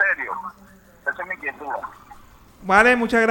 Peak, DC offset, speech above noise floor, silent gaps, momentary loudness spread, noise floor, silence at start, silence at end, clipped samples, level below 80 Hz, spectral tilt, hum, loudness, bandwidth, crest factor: -2 dBFS; under 0.1%; 26 dB; none; 20 LU; -47 dBFS; 0 s; 0 s; under 0.1%; -50 dBFS; -4.5 dB/octave; none; -20 LUFS; 19 kHz; 20 dB